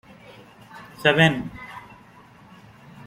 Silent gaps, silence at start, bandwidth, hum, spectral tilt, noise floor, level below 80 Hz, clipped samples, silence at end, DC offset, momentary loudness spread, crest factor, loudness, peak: none; 0.75 s; 15 kHz; none; -5.5 dB/octave; -49 dBFS; -56 dBFS; under 0.1%; 0.05 s; under 0.1%; 27 LU; 24 dB; -20 LUFS; -2 dBFS